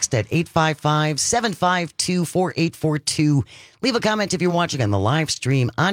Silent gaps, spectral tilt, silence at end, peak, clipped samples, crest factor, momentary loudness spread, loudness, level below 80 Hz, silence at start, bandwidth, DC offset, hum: none; -4.5 dB/octave; 0 s; -2 dBFS; under 0.1%; 18 dB; 3 LU; -20 LUFS; -54 dBFS; 0 s; 16.5 kHz; under 0.1%; none